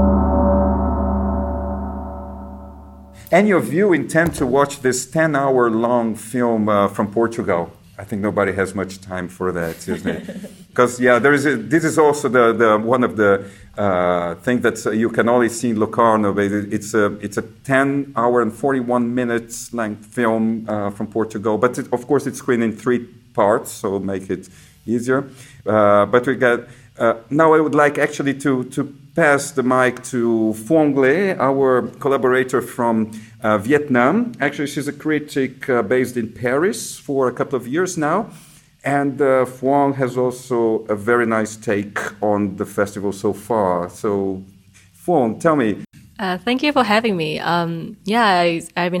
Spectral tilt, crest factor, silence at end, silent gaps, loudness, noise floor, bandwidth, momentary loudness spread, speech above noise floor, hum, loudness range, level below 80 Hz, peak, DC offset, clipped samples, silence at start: -5.5 dB/octave; 16 dB; 0 s; none; -18 LUFS; -48 dBFS; 17.5 kHz; 10 LU; 30 dB; none; 4 LU; -36 dBFS; -2 dBFS; under 0.1%; under 0.1%; 0 s